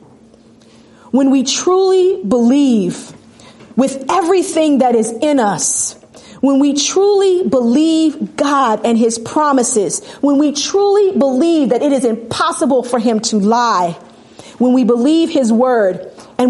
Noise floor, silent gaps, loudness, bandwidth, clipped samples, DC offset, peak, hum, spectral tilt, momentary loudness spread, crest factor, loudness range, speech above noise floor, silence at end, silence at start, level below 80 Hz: -44 dBFS; none; -13 LUFS; 11.5 kHz; under 0.1%; under 0.1%; -2 dBFS; none; -4 dB/octave; 6 LU; 12 dB; 2 LU; 32 dB; 0 s; 1.15 s; -60 dBFS